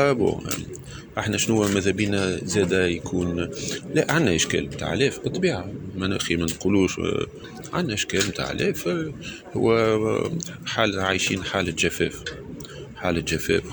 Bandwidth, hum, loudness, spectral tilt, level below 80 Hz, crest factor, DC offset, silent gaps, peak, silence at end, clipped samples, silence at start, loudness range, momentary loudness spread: over 20 kHz; none; -24 LUFS; -4.5 dB/octave; -46 dBFS; 20 dB; under 0.1%; none; -4 dBFS; 0 s; under 0.1%; 0 s; 2 LU; 12 LU